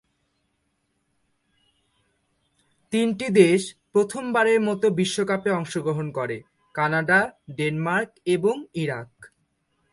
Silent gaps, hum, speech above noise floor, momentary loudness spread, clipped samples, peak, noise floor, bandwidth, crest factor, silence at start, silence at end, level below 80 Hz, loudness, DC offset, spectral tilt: none; none; 50 dB; 10 LU; under 0.1%; -4 dBFS; -73 dBFS; 11.5 kHz; 22 dB; 2.9 s; 0.65 s; -66 dBFS; -23 LUFS; under 0.1%; -5.5 dB/octave